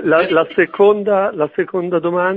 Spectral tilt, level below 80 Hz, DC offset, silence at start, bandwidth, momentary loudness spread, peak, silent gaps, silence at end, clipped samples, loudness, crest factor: -8.5 dB/octave; -58 dBFS; under 0.1%; 0 s; 4.8 kHz; 6 LU; 0 dBFS; none; 0 s; under 0.1%; -15 LUFS; 14 dB